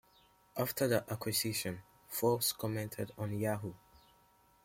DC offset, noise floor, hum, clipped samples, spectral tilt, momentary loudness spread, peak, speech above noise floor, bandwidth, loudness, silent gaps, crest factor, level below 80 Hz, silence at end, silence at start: under 0.1%; -68 dBFS; none; under 0.1%; -4 dB/octave; 10 LU; -18 dBFS; 32 dB; 16.5 kHz; -36 LUFS; none; 20 dB; -68 dBFS; 0.65 s; 0.55 s